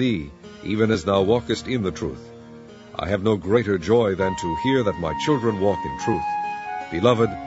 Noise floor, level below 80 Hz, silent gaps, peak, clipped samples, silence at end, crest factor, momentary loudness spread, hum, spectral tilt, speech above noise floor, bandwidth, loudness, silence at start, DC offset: -42 dBFS; -46 dBFS; none; -4 dBFS; under 0.1%; 0 s; 20 dB; 16 LU; none; -6.5 dB/octave; 21 dB; 8 kHz; -22 LUFS; 0 s; under 0.1%